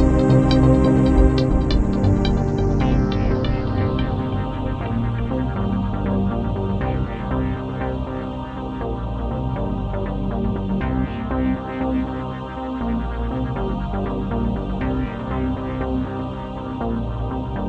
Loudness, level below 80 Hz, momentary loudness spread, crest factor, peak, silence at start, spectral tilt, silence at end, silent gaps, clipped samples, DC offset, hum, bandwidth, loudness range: -22 LUFS; -26 dBFS; 11 LU; 18 dB; -2 dBFS; 0 s; -8.5 dB/octave; 0 s; none; under 0.1%; under 0.1%; none; 8.6 kHz; 7 LU